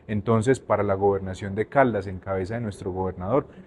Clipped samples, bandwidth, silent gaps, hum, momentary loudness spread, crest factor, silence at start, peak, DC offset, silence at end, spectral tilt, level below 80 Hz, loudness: under 0.1%; 11.5 kHz; none; none; 9 LU; 20 dB; 0.1 s; -4 dBFS; under 0.1%; 0.05 s; -7.5 dB/octave; -52 dBFS; -25 LUFS